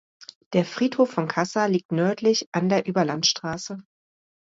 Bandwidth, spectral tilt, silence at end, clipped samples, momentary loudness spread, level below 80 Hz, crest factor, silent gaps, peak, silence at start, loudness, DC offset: 7.8 kHz; -4.5 dB/octave; 0.7 s; under 0.1%; 9 LU; -66 dBFS; 18 dB; 0.35-0.51 s, 1.85-1.89 s, 2.46-2.52 s; -8 dBFS; 0.2 s; -23 LUFS; under 0.1%